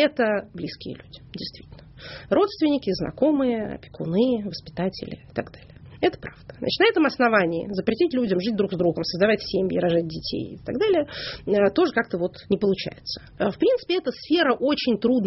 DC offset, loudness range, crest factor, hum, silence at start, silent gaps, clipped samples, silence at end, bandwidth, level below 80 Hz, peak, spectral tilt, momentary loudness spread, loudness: under 0.1%; 4 LU; 18 dB; none; 0 s; none; under 0.1%; 0 s; 6 kHz; -52 dBFS; -6 dBFS; -4 dB/octave; 15 LU; -23 LUFS